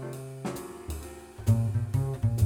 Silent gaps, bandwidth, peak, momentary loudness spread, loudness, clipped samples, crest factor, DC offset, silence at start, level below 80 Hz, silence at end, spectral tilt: none; 17 kHz; -12 dBFS; 13 LU; -31 LUFS; under 0.1%; 16 dB; under 0.1%; 0 s; -44 dBFS; 0 s; -7.5 dB/octave